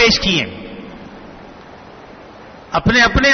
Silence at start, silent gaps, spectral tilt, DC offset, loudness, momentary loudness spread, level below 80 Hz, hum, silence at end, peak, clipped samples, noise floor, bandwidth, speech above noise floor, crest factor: 0 s; none; -4 dB/octave; under 0.1%; -14 LUFS; 26 LU; -32 dBFS; none; 0 s; -2 dBFS; under 0.1%; -38 dBFS; 6.6 kHz; 24 dB; 16 dB